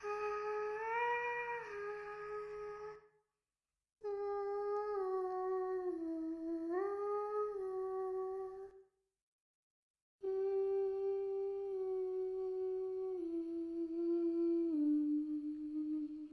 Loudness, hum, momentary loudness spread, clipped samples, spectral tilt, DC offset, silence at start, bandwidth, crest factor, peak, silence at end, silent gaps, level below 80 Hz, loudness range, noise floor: -40 LUFS; none; 10 LU; under 0.1%; -6 dB/octave; under 0.1%; 0 s; 6.4 kHz; 12 dB; -28 dBFS; 0 s; 9.22-9.94 s, 10.02-10.19 s; -76 dBFS; 6 LU; under -90 dBFS